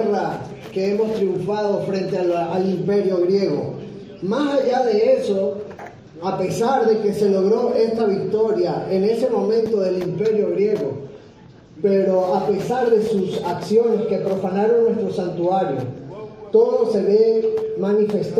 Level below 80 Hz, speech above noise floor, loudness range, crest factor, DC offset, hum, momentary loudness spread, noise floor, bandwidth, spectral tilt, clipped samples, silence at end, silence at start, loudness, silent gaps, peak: -60 dBFS; 26 dB; 2 LU; 16 dB; under 0.1%; none; 10 LU; -44 dBFS; 12 kHz; -7 dB/octave; under 0.1%; 0 s; 0 s; -20 LUFS; none; -4 dBFS